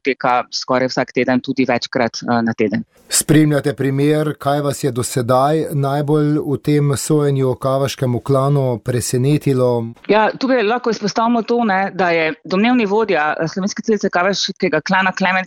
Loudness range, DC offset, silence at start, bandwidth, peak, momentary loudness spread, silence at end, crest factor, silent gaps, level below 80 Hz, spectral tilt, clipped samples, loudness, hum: 1 LU; under 0.1%; 0.05 s; 16.5 kHz; -2 dBFS; 4 LU; 0 s; 14 dB; none; -52 dBFS; -5.5 dB/octave; under 0.1%; -17 LUFS; none